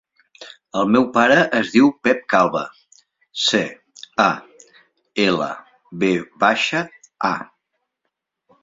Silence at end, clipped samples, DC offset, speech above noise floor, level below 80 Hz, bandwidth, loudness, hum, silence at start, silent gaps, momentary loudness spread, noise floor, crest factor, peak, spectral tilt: 1.15 s; under 0.1%; under 0.1%; 60 dB; -62 dBFS; 7.8 kHz; -18 LUFS; none; 0.4 s; none; 15 LU; -78 dBFS; 20 dB; 0 dBFS; -4.5 dB/octave